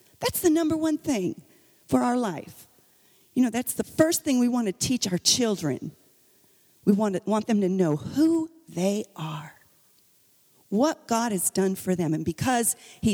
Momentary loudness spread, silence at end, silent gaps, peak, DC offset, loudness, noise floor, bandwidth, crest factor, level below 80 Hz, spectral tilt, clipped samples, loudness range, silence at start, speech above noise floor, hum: 10 LU; 0 s; none; -6 dBFS; under 0.1%; -25 LUFS; -62 dBFS; over 20 kHz; 20 dB; -58 dBFS; -4.5 dB/octave; under 0.1%; 4 LU; 0.2 s; 37 dB; none